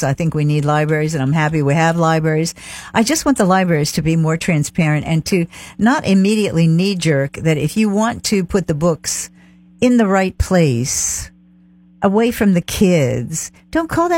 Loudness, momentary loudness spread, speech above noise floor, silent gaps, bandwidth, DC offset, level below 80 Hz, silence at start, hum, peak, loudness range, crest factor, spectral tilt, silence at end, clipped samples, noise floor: -16 LUFS; 7 LU; 32 dB; none; 16.5 kHz; under 0.1%; -38 dBFS; 0 s; none; -2 dBFS; 2 LU; 14 dB; -5.5 dB/octave; 0 s; under 0.1%; -48 dBFS